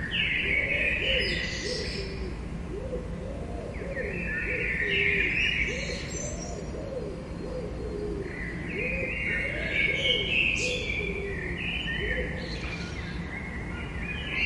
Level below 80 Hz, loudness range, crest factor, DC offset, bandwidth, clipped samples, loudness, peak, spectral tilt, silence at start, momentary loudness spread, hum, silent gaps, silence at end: -40 dBFS; 6 LU; 18 dB; under 0.1%; 11.5 kHz; under 0.1%; -29 LUFS; -12 dBFS; -4 dB/octave; 0 s; 13 LU; none; none; 0 s